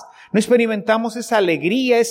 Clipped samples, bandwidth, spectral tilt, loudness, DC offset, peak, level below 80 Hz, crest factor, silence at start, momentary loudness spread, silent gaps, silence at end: under 0.1%; 16 kHz; -4.5 dB/octave; -18 LUFS; under 0.1%; -4 dBFS; -68 dBFS; 14 dB; 0 s; 4 LU; none; 0 s